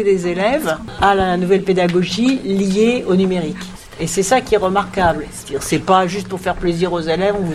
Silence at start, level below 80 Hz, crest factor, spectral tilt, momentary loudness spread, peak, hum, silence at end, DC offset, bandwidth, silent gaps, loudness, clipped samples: 0 s; -38 dBFS; 16 dB; -5 dB/octave; 8 LU; 0 dBFS; none; 0 s; under 0.1%; 15.5 kHz; none; -17 LUFS; under 0.1%